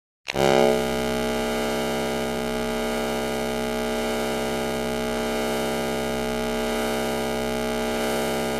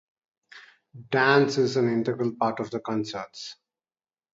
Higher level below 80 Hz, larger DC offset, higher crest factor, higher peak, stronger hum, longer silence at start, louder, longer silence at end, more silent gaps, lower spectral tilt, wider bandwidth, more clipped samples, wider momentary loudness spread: first, -40 dBFS vs -70 dBFS; neither; about the same, 22 dB vs 22 dB; about the same, -4 dBFS vs -4 dBFS; neither; second, 0.25 s vs 0.55 s; about the same, -25 LUFS vs -25 LUFS; second, 0 s vs 0.8 s; neither; second, -4 dB/octave vs -5.5 dB/octave; first, 16 kHz vs 7.8 kHz; neither; second, 5 LU vs 16 LU